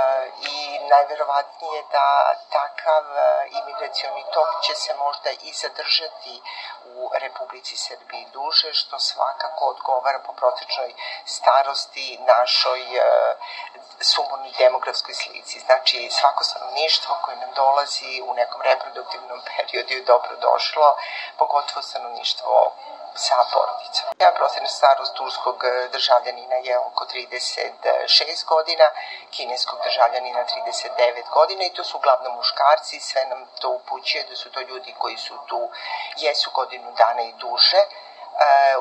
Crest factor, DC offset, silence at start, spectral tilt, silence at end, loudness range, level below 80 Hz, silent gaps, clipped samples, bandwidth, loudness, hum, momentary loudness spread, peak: 20 dB; under 0.1%; 0 s; 2 dB/octave; 0 s; 4 LU; under -90 dBFS; none; under 0.1%; 11 kHz; -21 LUFS; none; 13 LU; -2 dBFS